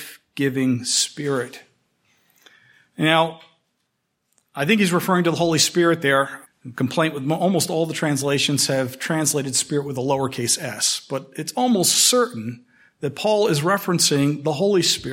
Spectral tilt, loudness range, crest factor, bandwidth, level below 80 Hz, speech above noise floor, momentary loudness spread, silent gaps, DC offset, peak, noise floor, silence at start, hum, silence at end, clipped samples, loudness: -3.5 dB/octave; 5 LU; 20 dB; 16.5 kHz; -64 dBFS; 53 dB; 10 LU; none; under 0.1%; -2 dBFS; -74 dBFS; 0 s; none; 0 s; under 0.1%; -20 LUFS